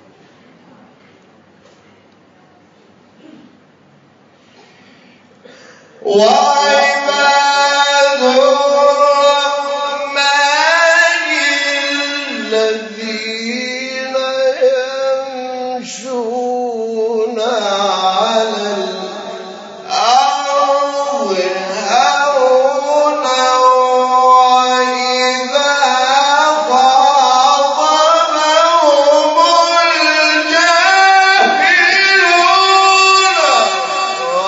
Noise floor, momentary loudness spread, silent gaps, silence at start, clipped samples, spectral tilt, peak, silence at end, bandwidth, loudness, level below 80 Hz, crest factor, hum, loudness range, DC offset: -47 dBFS; 11 LU; none; 6.05 s; under 0.1%; -1 dB/octave; 0 dBFS; 0 s; 8 kHz; -11 LUFS; -76 dBFS; 12 dB; none; 8 LU; under 0.1%